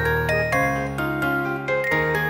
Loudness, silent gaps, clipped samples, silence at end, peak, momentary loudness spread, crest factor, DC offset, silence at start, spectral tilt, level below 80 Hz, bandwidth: -22 LUFS; none; under 0.1%; 0 s; -8 dBFS; 4 LU; 14 dB; under 0.1%; 0 s; -6 dB/octave; -40 dBFS; 17 kHz